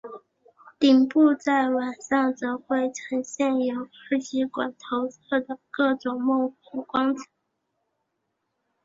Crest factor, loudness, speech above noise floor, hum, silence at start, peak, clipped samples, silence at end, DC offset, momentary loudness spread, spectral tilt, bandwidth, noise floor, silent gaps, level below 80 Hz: 18 dB; -25 LUFS; 54 dB; none; 0.05 s; -8 dBFS; under 0.1%; 1.6 s; under 0.1%; 11 LU; -3.5 dB/octave; 7.8 kHz; -78 dBFS; none; -70 dBFS